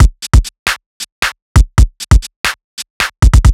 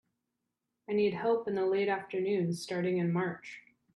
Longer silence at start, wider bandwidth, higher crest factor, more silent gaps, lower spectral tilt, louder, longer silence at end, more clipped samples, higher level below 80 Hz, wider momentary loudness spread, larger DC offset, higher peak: second, 0 s vs 0.9 s; first, 14.5 kHz vs 12 kHz; about the same, 10 dB vs 14 dB; first, 0.59-0.66 s, 0.86-1.00 s, 1.12-1.22 s, 1.42-1.55 s, 2.36-2.44 s, 2.64-2.77 s, 2.90-3.00 s vs none; second, -4.5 dB/octave vs -6.5 dB/octave; first, -14 LUFS vs -32 LUFS; second, 0 s vs 0.35 s; first, 5% vs under 0.1%; first, -12 dBFS vs -76 dBFS; first, 11 LU vs 8 LU; neither; first, 0 dBFS vs -18 dBFS